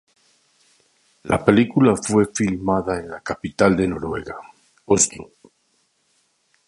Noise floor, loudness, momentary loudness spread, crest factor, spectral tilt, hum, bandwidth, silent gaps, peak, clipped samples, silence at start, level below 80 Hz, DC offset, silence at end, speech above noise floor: -66 dBFS; -20 LUFS; 13 LU; 22 dB; -5 dB/octave; none; 11.5 kHz; none; 0 dBFS; under 0.1%; 1.25 s; -48 dBFS; under 0.1%; 1.45 s; 46 dB